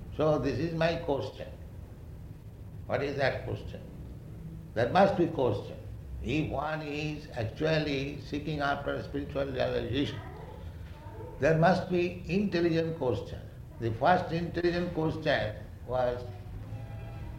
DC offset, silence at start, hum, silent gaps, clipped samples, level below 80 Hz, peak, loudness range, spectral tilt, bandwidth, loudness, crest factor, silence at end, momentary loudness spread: under 0.1%; 0 s; none; none; under 0.1%; -48 dBFS; -10 dBFS; 4 LU; -7 dB/octave; 16 kHz; -30 LUFS; 20 dB; 0 s; 18 LU